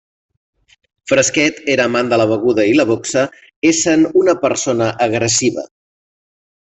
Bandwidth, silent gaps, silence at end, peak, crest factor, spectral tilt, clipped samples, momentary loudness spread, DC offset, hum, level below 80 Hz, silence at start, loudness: 8.4 kHz; 3.56-3.62 s; 1.15 s; -2 dBFS; 14 dB; -3.5 dB/octave; under 0.1%; 6 LU; under 0.1%; none; -56 dBFS; 1.05 s; -14 LUFS